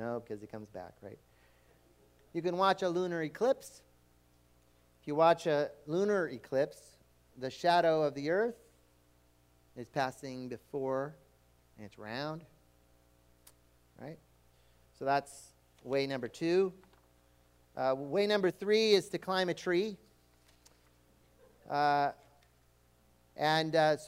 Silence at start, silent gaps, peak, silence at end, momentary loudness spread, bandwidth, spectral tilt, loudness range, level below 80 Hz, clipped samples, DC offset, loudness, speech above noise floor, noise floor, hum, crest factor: 0 s; none; -12 dBFS; 0 s; 22 LU; 16 kHz; -5 dB/octave; 10 LU; -72 dBFS; under 0.1%; under 0.1%; -33 LUFS; 35 dB; -67 dBFS; 60 Hz at -70 dBFS; 22 dB